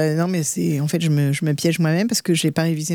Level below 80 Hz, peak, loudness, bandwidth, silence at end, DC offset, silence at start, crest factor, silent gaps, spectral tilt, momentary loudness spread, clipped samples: -64 dBFS; -4 dBFS; -20 LUFS; 18 kHz; 0 s; under 0.1%; 0 s; 14 dB; none; -5 dB/octave; 2 LU; under 0.1%